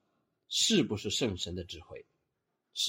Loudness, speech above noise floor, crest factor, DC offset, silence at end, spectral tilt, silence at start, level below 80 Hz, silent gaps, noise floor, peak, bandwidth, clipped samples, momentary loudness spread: -30 LUFS; 51 dB; 18 dB; under 0.1%; 0 s; -3 dB/octave; 0.5 s; -62 dBFS; none; -83 dBFS; -16 dBFS; 16 kHz; under 0.1%; 20 LU